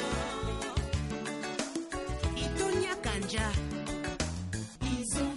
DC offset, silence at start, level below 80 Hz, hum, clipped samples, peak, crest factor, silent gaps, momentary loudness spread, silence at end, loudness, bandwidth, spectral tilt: under 0.1%; 0 s; -40 dBFS; none; under 0.1%; -18 dBFS; 16 dB; none; 5 LU; 0 s; -34 LUFS; 11.5 kHz; -4.5 dB/octave